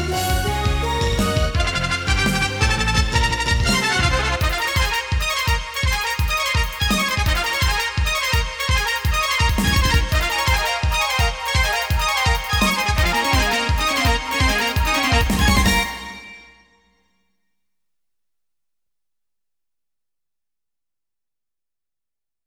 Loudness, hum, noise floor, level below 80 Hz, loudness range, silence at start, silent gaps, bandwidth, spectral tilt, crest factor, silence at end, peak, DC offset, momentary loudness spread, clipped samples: -19 LUFS; none; under -90 dBFS; -26 dBFS; 2 LU; 0 s; none; over 20 kHz; -3.5 dB/octave; 18 dB; 6.05 s; -2 dBFS; under 0.1%; 4 LU; under 0.1%